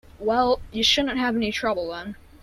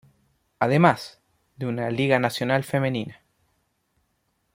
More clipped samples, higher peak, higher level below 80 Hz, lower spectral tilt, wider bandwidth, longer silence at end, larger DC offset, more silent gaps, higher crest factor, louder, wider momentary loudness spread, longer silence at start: neither; second, -8 dBFS vs -2 dBFS; first, -46 dBFS vs -64 dBFS; second, -3 dB/octave vs -6.5 dB/octave; about the same, 15 kHz vs 16.5 kHz; second, 0.05 s vs 1.4 s; neither; neither; second, 16 dB vs 22 dB; about the same, -23 LUFS vs -23 LUFS; about the same, 13 LU vs 14 LU; second, 0.15 s vs 0.6 s